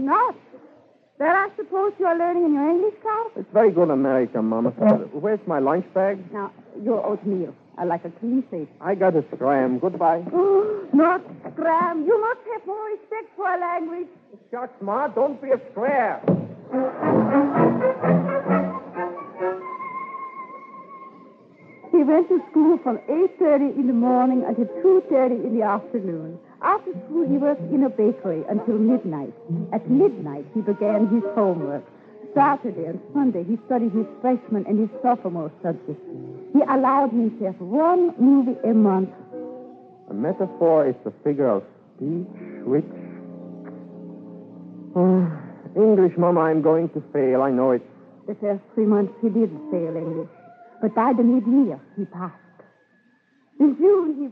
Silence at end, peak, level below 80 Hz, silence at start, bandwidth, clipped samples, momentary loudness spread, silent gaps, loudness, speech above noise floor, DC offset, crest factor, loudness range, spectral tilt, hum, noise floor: 0 s; -4 dBFS; -78 dBFS; 0 s; 4.7 kHz; under 0.1%; 16 LU; none; -22 LUFS; 41 dB; under 0.1%; 18 dB; 6 LU; -11 dB/octave; none; -61 dBFS